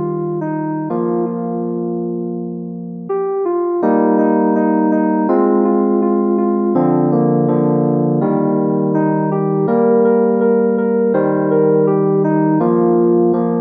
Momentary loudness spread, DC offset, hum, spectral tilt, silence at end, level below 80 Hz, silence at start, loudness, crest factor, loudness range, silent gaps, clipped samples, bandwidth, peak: 7 LU; under 0.1%; none; -13 dB/octave; 0 s; -64 dBFS; 0 s; -15 LUFS; 12 dB; 5 LU; none; under 0.1%; 2.8 kHz; -2 dBFS